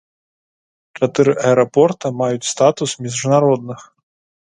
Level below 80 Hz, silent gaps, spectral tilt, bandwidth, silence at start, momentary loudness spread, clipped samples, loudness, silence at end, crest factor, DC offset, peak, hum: -62 dBFS; none; -5 dB/octave; 11 kHz; 0.95 s; 8 LU; under 0.1%; -16 LUFS; 0.6 s; 18 dB; under 0.1%; 0 dBFS; none